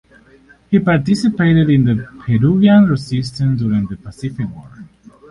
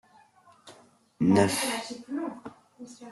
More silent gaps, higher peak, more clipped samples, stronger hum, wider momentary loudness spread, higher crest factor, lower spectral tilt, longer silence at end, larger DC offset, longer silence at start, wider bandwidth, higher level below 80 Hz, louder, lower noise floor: neither; first, 0 dBFS vs -10 dBFS; neither; neither; second, 15 LU vs 25 LU; second, 14 dB vs 20 dB; first, -8 dB/octave vs -5 dB/octave; first, 0.45 s vs 0 s; neither; about the same, 0.7 s vs 0.65 s; second, 11 kHz vs 12.5 kHz; first, -42 dBFS vs -66 dBFS; first, -15 LUFS vs -27 LUFS; second, -48 dBFS vs -59 dBFS